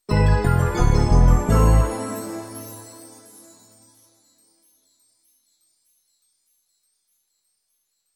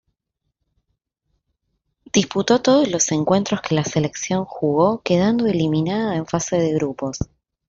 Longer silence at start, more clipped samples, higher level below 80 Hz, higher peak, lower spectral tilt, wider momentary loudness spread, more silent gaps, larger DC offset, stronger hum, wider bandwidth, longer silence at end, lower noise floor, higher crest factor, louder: second, 0.1 s vs 2.15 s; neither; first, -24 dBFS vs -50 dBFS; about the same, -4 dBFS vs -2 dBFS; first, -7 dB/octave vs -5 dB/octave; first, 22 LU vs 7 LU; neither; neither; neither; first, 14.5 kHz vs 8 kHz; first, 5.3 s vs 0.45 s; second, -73 dBFS vs -77 dBFS; about the same, 18 dB vs 18 dB; about the same, -19 LUFS vs -20 LUFS